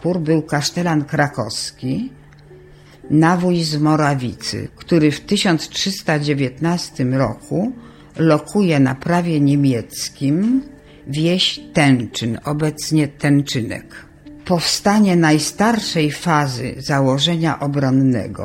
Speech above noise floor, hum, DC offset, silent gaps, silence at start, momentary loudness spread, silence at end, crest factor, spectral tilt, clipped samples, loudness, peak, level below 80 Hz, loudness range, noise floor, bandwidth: 26 dB; none; under 0.1%; none; 0 s; 9 LU; 0 s; 16 dB; -5.5 dB/octave; under 0.1%; -18 LUFS; 0 dBFS; -48 dBFS; 3 LU; -43 dBFS; 16 kHz